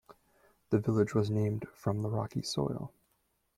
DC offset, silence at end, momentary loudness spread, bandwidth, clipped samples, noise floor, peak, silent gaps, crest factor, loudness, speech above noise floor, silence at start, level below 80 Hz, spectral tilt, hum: under 0.1%; 0.7 s; 7 LU; 13.5 kHz; under 0.1%; -76 dBFS; -14 dBFS; none; 18 dB; -33 LUFS; 45 dB; 0.1 s; -64 dBFS; -7 dB/octave; none